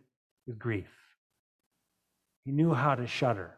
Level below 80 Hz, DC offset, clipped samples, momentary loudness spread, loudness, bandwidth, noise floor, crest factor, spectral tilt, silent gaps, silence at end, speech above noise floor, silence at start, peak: -64 dBFS; under 0.1%; under 0.1%; 20 LU; -30 LUFS; 10.5 kHz; -82 dBFS; 20 dB; -7.5 dB/octave; 1.17-1.30 s, 1.39-1.59 s, 1.66-1.71 s, 2.36-2.43 s; 0.05 s; 51 dB; 0.45 s; -14 dBFS